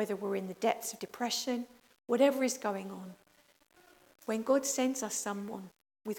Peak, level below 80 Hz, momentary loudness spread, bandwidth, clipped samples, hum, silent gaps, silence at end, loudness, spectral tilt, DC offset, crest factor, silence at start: -14 dBFS; -82 dBFS; 18 LU; 18 kHz; under 0.1%; none; none; 0 s; -33 LUFS; -3.5 dB/octave; under 0.1%; 22 dB; 0 s